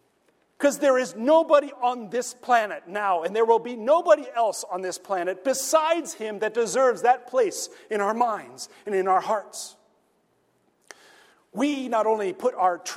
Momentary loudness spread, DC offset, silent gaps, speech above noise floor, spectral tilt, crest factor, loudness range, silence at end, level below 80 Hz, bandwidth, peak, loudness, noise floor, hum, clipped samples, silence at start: 10 LU; under 0.1%; none; 44 dB; -3 dB/octave; 18 dB; 6 LU; 0 s; -80 dBFS; 16 kHz; -6 dBFS; -24 LUFS; -67 dBFS; none; under 0.1%; 0.6 s